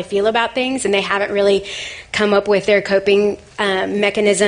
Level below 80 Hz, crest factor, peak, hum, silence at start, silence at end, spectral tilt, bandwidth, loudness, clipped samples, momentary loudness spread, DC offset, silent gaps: -50 dBFS; 16 dB; -2 dBFS; none; 0 s; 0 s; -3.5 dB/octave; 10 kHz; -17 LUFS; under 0.1%; 6 LU; under 0.1%; none